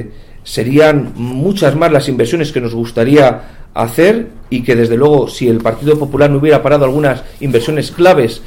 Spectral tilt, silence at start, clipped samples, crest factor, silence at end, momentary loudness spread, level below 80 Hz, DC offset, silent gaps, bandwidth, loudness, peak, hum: -6.5 dB/octave; 0 s; under 0.1%; 12 dB; 0 s; 10 LU; -34 dBFS; under 0.1%; none; 16.5 kHz; -11 LUFS; 0 dBFS; none